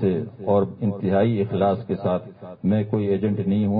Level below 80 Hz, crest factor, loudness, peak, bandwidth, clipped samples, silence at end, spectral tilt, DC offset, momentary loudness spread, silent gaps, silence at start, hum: -48 dBFS; 14 dB; -23 LUFS; -6 dBFS; 4.6 kHz; under 0.1%; 0 s; -13 dB/octave; under 0.1%; 6 LU; none; 0 s; none